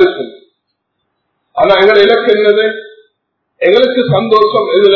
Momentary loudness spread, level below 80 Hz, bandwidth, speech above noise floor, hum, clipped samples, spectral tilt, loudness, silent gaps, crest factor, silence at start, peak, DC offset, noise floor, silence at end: 16 LU; -50 dBFS; 6 kHz; 60 dB; none; 0.7%; -7 dB/octave; -9 LUFS; none; 10 dB; 0 s; 0 dBFS; under 0.1%; -68 dBFS; 0 s